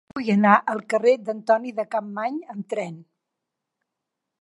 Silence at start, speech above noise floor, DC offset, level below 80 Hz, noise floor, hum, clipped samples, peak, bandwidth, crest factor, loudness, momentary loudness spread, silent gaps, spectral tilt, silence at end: 0.15 s; 61 dB; under 0.1%; -74 dBFS; -83 dBFS; none; under 0.1%; -2 dBFS; 11.5 kHz; 22 dB; -22 LUFS; 13 LU; none; -7 dB/octave; 1.4 s